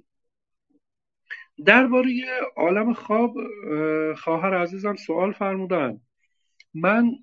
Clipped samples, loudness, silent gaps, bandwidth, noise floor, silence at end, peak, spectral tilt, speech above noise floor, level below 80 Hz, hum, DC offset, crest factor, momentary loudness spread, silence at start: under 0.1%; -22 LUFS; none; 7 kHz; -83 dBFS; 0.05 s; 0 dBFS; -7 dB/octave; 61 dB; -76 dBFS; none; under 0.1%; 24 dB; 15 LU; 1.3 s